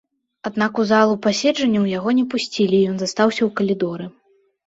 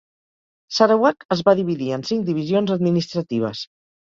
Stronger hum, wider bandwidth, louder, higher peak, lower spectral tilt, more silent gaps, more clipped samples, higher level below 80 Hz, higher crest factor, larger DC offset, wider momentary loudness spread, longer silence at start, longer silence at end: neither; about the same, 8 kHz vs 7.6 kHz; about the same, -19 LUFS vs -20 LUFS; about the same, -4 dBFS vs -2 dBFS; second, -5 dB/octave vs -6.5 dB/octave; second, none vs 1.25-1.29 s; neither; about the same, -62 dBFS vs -62 dBFS; about the same, 16 dB vs 18 dB; neither; about the same, 10 LU vs 10 LU; second, 0.45 s vs 0.7 s; about the same, 0.55 s vs 0.5 s